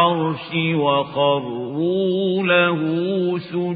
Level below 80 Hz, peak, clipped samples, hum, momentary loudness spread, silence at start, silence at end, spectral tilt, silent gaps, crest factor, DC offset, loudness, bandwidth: -66 dBFS; -2 dBFS; under 0.1%; none; 7 LU; 0 s; 0 s; -11 dB/octave; none; 18 dB; under 0.1%; -20 LUFS; 5 kHz